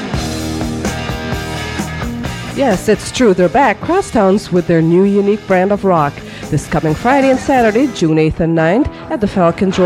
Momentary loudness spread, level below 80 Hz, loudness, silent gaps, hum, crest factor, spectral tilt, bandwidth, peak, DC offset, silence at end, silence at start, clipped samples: 10 LU; -34 dBFS; -14 LUFS; none; none; 12 dB; -6 dB/octave; 16 kHz; 0 dBFS; under 0.1%; 0 s; 0 s; under 0.1%